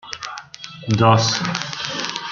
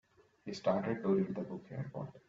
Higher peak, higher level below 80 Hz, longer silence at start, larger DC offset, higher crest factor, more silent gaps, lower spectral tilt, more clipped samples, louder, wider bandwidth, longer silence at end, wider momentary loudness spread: first, -2 dBFS vs -20 dBFS; first, -54 dBFS vs -72 dBFS; second, 0.05 s vs 0.45 s; neither; about the same, 20 dB vs 18 dB; neither; second, -4.5 dB/octave vs -7.5 dB/octave; neither; first, -19 LUFS vs -37 LUFS; about the same, 7.4 kHz vs 7.6 kHz; about the same, 0 s vs 0.1 s; first, 18 LU vs 12 LU